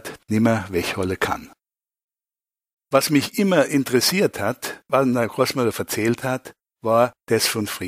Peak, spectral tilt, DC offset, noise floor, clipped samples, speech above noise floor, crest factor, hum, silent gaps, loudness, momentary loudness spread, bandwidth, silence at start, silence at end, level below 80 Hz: -2 dBFS; -4.5 dB/octave; under 0.1%; under -90 dBFS; under 0.1%; over 69 dB; 20 dB; none; 2.04-2.08 s, 2.73-2.77 s; -21 LUFS; 8 LU; 16 kHz; 0.05 s; 0 s; -56 dBFS